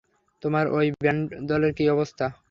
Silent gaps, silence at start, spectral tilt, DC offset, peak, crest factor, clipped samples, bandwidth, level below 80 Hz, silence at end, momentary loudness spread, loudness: none; 0.45 s; -8 dB/octave; under 0.1%; -8 dBFS; 16 dB; under 0.1%; 7.2 kHz; -54 dBFS; 0.2 s; 6 LU; -25 LUFS